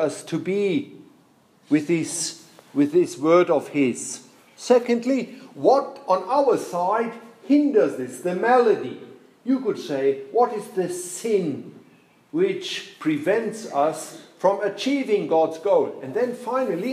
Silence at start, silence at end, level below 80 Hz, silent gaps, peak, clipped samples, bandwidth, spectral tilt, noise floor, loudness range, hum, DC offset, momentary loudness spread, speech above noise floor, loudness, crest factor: 0 s; 0 s; -80 dBFS; none; -4 dBFS; under 0.1%; 15 kHz; -5 dB/octave; -57 dBFS; 4 LU; none; under 0.1%; 12 LU; 35 dB; -23 LUFS; 18 dB